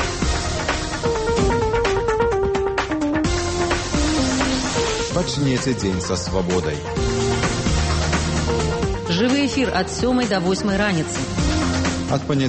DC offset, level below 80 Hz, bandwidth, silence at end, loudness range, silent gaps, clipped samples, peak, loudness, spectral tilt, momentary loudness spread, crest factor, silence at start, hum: under 0.1%; -30 dBFS; 8.8 kHz; 0 s; 1 LU; none; under 0.1%; -8 dBFS; -20 LUFS; -4.5 dB/octave; 3 LU; 12 dB; 0 s; none